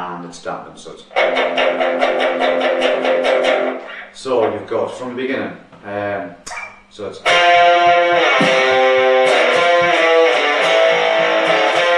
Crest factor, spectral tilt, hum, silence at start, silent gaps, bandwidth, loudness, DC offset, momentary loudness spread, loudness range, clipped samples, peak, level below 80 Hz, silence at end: 14 dB; -3 dB/octave; none; 0 s; none; 11 kHz; -14 LUFS; under 0.1%; 17 LU; 9 LU; under 0.1%; 0 dBFS; -58 dBFS; 0 s